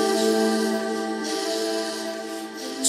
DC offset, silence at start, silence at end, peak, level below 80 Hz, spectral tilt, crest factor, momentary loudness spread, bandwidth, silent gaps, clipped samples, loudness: under 0.1%; 0 s; 0 s; -6 dBFS; -74 dBFS; -2.5 dB/octave; 18 dB; 11 LU; 16 kHz; none; under 0.1%; -25 LUFS